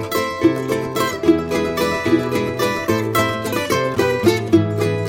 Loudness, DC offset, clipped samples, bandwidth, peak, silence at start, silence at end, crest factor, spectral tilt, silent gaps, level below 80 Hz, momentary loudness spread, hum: -18 LUFS; under 0.1%; under 0.1%; 17 kHz; -2 dBFS; 0 s; 0 s; 16 dB; -5.5 dB/octave; none; -46 dBFS; 5 LU; none